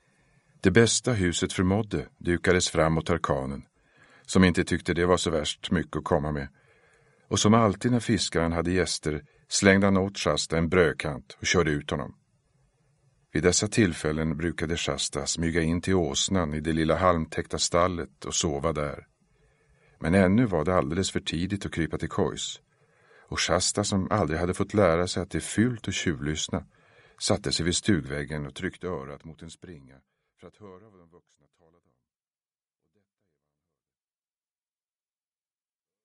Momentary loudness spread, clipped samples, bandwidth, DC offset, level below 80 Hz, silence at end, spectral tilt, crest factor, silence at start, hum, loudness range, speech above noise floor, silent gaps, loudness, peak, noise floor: 12 LU; under 0.1%; 11.5 kHz; under 0.1%; -48 dBFS; 5.25 s; -4.5 dB/octave; 24 dB; 0.65 s; none; 5 LU; over 64 dB; none; -26 LUFS; -2 dBFS; under -90 dBFS